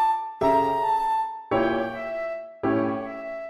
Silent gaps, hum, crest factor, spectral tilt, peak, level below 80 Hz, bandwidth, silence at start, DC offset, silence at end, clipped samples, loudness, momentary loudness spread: none; none; 14 dB; -6.5 dB/octave; -10 dBFS; -56 dBFS; 13.5 kHz; 0 s; under 0.1%; 0 s; under 0.1%; -25 LUFS; 9 LU